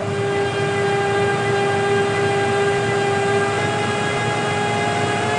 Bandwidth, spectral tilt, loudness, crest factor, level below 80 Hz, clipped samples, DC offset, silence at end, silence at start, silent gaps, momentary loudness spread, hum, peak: 10.5 kHz; -5 dB/octave; -19 LUFS; 12 dB; -52 dBFS; under 0.1%; under 0.1%; 0 s; 0 s; none; 2 LU; none; -6 dBFS